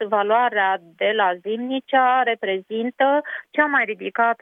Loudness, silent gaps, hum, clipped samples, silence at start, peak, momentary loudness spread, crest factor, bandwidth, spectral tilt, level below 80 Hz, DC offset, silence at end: -20 LUFS; none; none; under 0.1%; 0 s; -4 dBFS; 8 LU; 18 dB; 3.9 kHz; -7 dB/octave; -84 dBFS; under 0.1%; 0.05 s